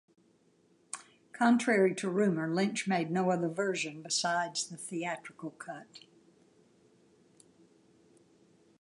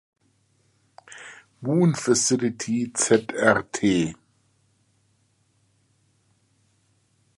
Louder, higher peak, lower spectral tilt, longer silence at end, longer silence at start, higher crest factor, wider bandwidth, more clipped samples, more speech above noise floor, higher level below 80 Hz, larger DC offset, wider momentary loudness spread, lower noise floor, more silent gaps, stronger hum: second, -31 LUFS vs -22 LUFS; second, -12 dBFS vs -2 dBFS; about the same, -4.5 dB/octave vs -4.5 dB/octave; second, 2.8 s vs 3.25 s; second, 0.95 s vs 1.1 s; about the same, 20 dB vs 24 dB; about the same, 11.5 kHz vs 11.5 kHz; neither; second, 37 dB vs 45 dB; second, -84 dBFS vs -62 dBFS; neither; second, 18 LU vs 22 LU; about the same, -68 dBFS vs -66 dBFS; neither; neither